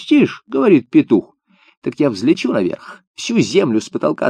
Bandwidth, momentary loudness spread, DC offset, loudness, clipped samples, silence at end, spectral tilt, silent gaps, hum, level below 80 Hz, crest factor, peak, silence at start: 9.8 kHz; 14 LU; under 0.1%; -16 LUFS; under 0.1%; 0 s; -6 dB/octave; 1.77-1.82 s, 3.07-3.14 s; none; -62 dBFS; 16 dB; 0 dBFS; 0 s